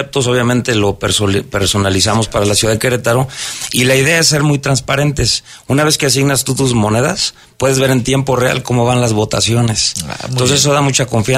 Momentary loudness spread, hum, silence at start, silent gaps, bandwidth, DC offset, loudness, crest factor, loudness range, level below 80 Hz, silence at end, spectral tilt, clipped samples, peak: 5 LU; none; 0 s; none; 16 kHz; under 0.1%; -13 LUFS; 12 dB; 1 LU; -36 dBFS; 0 s; -4 dB/octave; under 0.1%; 0 dBFS